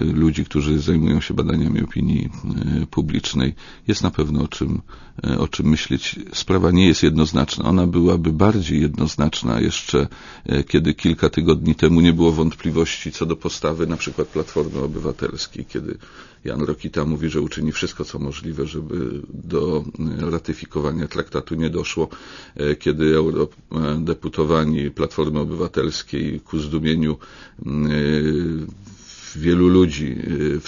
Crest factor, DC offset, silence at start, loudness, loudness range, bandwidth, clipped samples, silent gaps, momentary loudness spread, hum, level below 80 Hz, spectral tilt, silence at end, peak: 20 dB; under 0.1%; 0 s; -20 LUFS; 7 LU; 7.4 kHz; under 0.1%; none; 11 LU; none; -34 dBFS; -6.5 dB/octave; 0 s; 0 dBFS